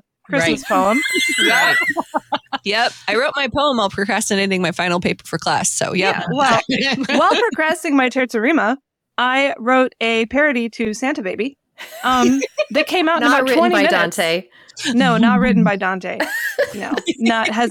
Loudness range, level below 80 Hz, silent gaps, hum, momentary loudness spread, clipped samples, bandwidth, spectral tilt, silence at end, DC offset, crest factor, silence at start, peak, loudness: 3 LU; -52 dBFS; none; none; 9 LU; under 0.1%; 19 kHz; -4 dB/octave; 0 s; under 0.1%; 12 dB; 0.3 s; -4 dBFS; -17 LUFS